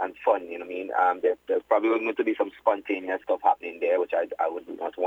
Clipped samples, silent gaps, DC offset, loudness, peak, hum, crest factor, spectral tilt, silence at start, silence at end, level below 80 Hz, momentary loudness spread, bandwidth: under 0.1%; none; under 0.1%; -26 LUFS; -8 dBFS; none; 18 dB; -5.5 dB/octave; 0 s; 0 s; -72 dBFS; 6 LU; 7.4 kHz